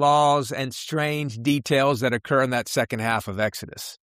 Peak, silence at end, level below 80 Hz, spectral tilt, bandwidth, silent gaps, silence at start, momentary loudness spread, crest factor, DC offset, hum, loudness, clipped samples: -8 dBFS; 0.1 s; -60 dBFS; -5 dB/octave; 15.5 kHz; none; 0 s; 8 LU; 14 dB; under 0.1%; none; -23 LUFS; under 0.1%